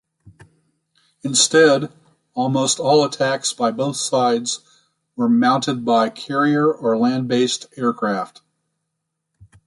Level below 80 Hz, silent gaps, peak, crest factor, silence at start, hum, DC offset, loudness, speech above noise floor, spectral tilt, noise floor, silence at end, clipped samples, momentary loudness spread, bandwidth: -66 dBFS; none; -2 dBFS; 18 dB; 0.25 s; none; under 0.1%; -18 LUFS; 59 dB; -3.5 dB/octave; -77 dBFS; 1.4 s; under 0.1%; 11 LU; 11.5 kHz